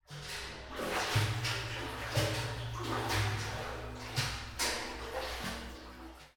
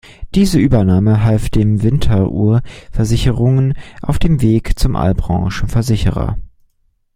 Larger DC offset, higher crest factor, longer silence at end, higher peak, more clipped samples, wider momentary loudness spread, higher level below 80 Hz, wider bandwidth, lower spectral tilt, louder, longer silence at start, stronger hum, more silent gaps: neither; first, 20 dB vs 14 dB; second, 0.05 s vs 0.7 s; second, -18 dBFS vs 0 dBFS; neither; first, 11 LU vs 8 LU; second, -50 dBFS vs -24 dBFS; first, 20 kHz vs 15.5 kHz; second, -3.5 dB/octave vs -7.5 dB/octave; second, -36 LUFS vs -15 LUFS; about the same, 0.1 s vs 0.2 s; neither; neither